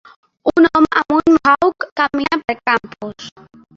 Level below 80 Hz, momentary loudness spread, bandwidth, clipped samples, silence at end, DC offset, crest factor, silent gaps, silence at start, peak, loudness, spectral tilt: -50 dBFS; 18 LU; 7.2 kHz; under 0.1%; 0.45 s; under 0.1%; 14 dB; 1.92-1.96 s; 0.45 s; -2 dBFS; -15 LUFS; -5.5 dB/octave